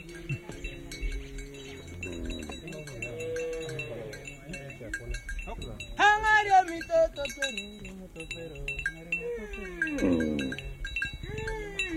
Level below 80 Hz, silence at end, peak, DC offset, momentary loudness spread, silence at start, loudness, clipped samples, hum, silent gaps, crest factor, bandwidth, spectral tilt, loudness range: -44 dBFS; 0 s; -10 dBFS; under 0.1%; 17 LU; 0 s; -31 LUFS; under 0.1%; none; none; 20 dB; 16 kHz; -4.5 dB/octave; 11 LU